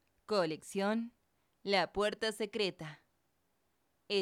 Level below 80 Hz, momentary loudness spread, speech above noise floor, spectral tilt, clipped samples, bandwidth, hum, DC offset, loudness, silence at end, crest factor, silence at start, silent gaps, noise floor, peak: -70 dBFS; 14 LU; 44 dB; -4 dB/octave; under 0.1%; 15 kHz; none; under 0.1%; -35 LUFS; 0 s; 18 dB; 0.3 s; none; -79 dBFS; -20 dBFS